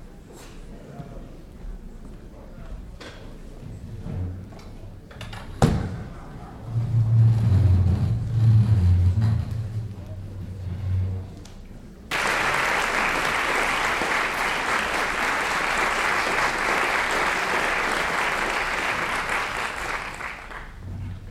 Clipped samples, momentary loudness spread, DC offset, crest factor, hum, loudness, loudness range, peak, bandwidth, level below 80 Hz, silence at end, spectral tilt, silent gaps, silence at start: under 0.1%; 23 LU; under 0.1%; 20 dB; none; -23 LUFS; 17 LU; -4 dBFS; 15 kHz; -40 dBFS; 0 s; -5 dB/octave; none; 0 s